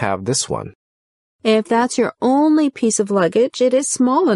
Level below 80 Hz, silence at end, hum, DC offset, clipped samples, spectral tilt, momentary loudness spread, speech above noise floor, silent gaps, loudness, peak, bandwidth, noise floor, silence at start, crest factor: -58 dBFS; 0 s; none; under 0.1%; under 0.1%; -4 dB/octave; 6 LU; over 74 dB; 0.75-1.39 s; -17 LUFS; -4 dBFS; 11.5 kHz; under -90 dBFS; 0 s; 12 dB